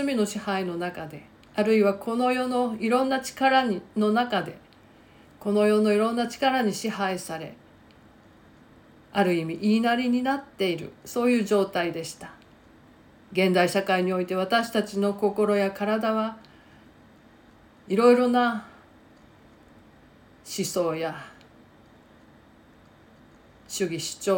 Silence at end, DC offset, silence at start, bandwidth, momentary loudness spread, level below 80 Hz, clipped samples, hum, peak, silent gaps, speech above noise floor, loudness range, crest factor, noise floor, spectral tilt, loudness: 0 s; under 0.1%; 0 s; 17 kHz; 14 LU; -64 dBFS; under 0.1%; none; -8 dBFS; none; 30 dB; 10 LU; 20 dB; -54 dBFS; -5 dB/octave; -25 LUFS